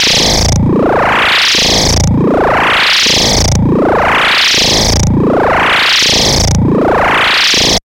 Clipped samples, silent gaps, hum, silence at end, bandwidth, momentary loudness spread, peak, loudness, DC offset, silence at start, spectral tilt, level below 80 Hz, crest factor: under 0.1%; none; none; 0.05 s; 17 kHz; 4 LU; 0 dBFS; -8 LUFS; under 0.1%; 0 s; -3 dB/octave; -22 dBFS; 8 dB